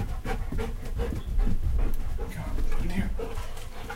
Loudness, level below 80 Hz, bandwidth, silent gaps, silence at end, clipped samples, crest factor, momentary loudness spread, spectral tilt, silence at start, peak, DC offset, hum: -33 LUFS; -28 dBFS; 14 kHz; none; 0 s; under 0.1%; 12 dB; 6 LU; -6.5 dB/octave; 0 s; -14 dBFS; under 0.1%; none